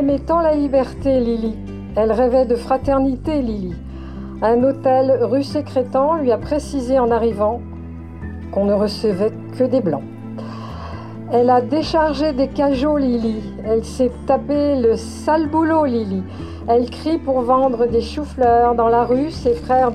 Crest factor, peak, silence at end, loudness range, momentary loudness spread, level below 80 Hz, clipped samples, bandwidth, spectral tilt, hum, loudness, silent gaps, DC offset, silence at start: 14 dB; -4 dBFS; 0 s; 3 LU; 15 LU; -36 dBFS; under 0.1%; 11.5 kHz; -7 dB/octave; none; -18 LUFS; none; 0.4%; 0 s